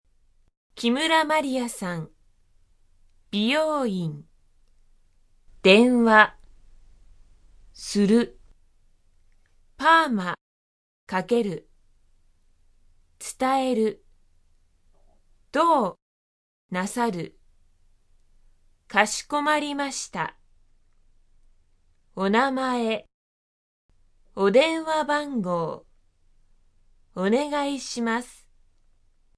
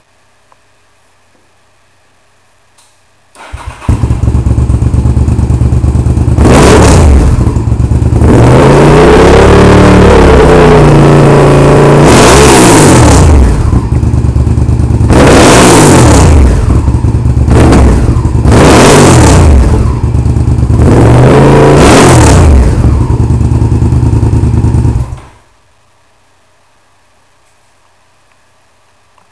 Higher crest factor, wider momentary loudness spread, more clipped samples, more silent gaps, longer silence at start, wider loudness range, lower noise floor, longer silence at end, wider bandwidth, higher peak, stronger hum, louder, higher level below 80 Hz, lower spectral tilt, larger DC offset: first, 26 dB vs 4 dB; first, 17 LU vs 8 LU; second, under 0.1% vs 10%; first, 10.41-11.07 s, 16.02-16.69 s, 23.14-23.89 s vs none; second, 0.75 s vs 3.4 s; about the same, 8 LU vs 10 LU; first, -61 dBFS vs -48 dBFS; second, 1.05 s vs 4.1 s; about the same, 11 kHz vs 11 kHz; about the same, -2 dBFS vs 0 dBFS; neither; second, -23 LUFS vs -4 LUFS; second, -58 dBFS vs -10 dBFS; second, -4.5 dB/octave vs -6 dB/octave; neither